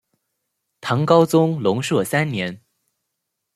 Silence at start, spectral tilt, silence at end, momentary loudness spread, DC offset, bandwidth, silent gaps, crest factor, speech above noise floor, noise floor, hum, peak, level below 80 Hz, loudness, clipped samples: 0.85 s; -6 dB/octave; 1 s; 12 LU; under 0.1%; 15 kHz; none; 18 dB; 60 dB; -78 dBFS; none; -2 dBFS; -64 dBFS; -19 LUFS; under 0.1%